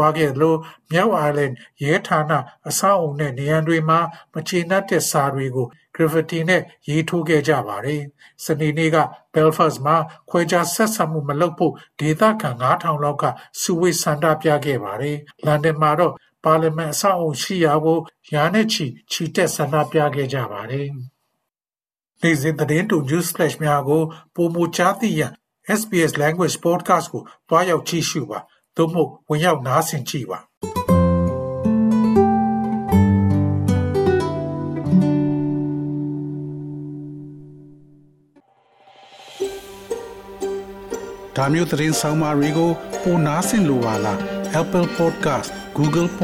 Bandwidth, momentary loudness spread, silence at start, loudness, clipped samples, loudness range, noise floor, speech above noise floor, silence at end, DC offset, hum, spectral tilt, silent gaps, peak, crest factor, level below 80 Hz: 16 kHz; 11 LU; 0 s; -20 LUFS; under 0.1%; 5 LU; under -90 dBFS; over 71 dB; 0 s; under 0.1%; none; -5.5 dB/octave; 30.57-30.61 s; -2 dBFS; 18 dB; -52 dBFS